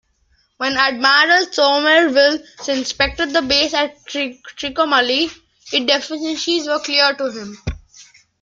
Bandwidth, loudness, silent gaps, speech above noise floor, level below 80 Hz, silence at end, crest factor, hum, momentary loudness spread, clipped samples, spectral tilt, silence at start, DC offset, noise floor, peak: 7.8 kHz; -16 LUFS; none; 44 dB; -44 dBFS; 0.4 s; 18 dB; none; 12 LU; under 0.1%; -2.5 dB/octave; 0.6 s; under 0.1%; -61 dBFS; 0 dBFS